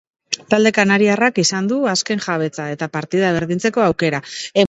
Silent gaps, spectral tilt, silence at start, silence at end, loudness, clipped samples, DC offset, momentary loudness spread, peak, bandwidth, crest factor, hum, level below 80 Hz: none; -4 dB/octave; 0.3 s; 0 s; -17 LUFS; under 0.1%; under 0.1%; 11 LU; 0 dBFS; 8.2 kHz; 18 dB; none; -54 dBFS